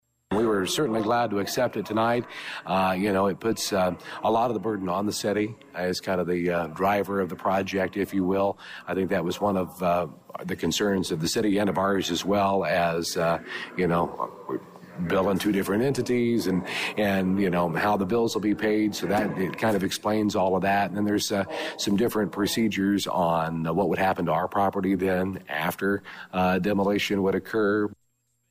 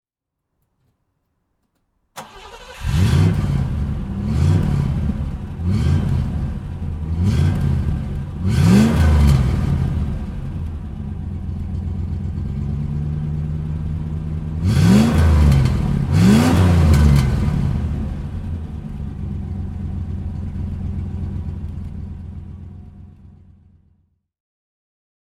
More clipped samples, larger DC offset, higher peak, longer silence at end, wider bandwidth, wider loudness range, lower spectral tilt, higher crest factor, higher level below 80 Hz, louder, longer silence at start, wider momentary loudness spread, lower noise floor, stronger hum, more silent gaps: neither; neither; second, -14 dBFS vs -2 dBFS; second, 0.55 s vs 2 s; first, 15.5 kHz vs 13.5 kHz; second, 2 LU vs 13 LU; second, -5 dB/octave vs -7.5 dB/octave; second, 10 dB vs 18 dB; second, -58 dBFS vs -26 dBFS; second, -26 LUFS vs -19 LUFS; second, 0.3 s vs 2.15 s; second, 5 LU vs 16 LU; second, -72 dBFS vs -80 dBFS; neither; neither